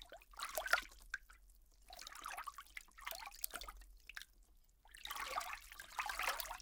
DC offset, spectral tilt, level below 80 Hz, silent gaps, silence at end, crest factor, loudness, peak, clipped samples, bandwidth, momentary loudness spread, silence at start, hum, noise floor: under 0.1%; 0.5 dB/octave; -64 dBFS; none; 0 s; 32 dB; -45 LUFS; -16 dBFS; under 0.1%; 18 kHz; 17 LU; 0 s; none; -68 dBFS